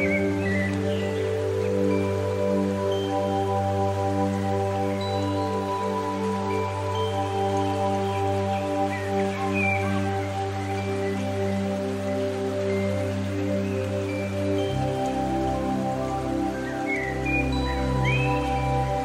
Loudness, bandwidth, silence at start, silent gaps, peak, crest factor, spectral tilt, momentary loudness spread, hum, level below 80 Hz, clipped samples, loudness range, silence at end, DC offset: -26 LUFS; 15 kHz; 0 s; none; -12 dBFS; 14 dB; -6.5 dB/octave; 4 LU; none; -42 dBFS; under 0.1%; 2 LU; 0 s; under 0.1%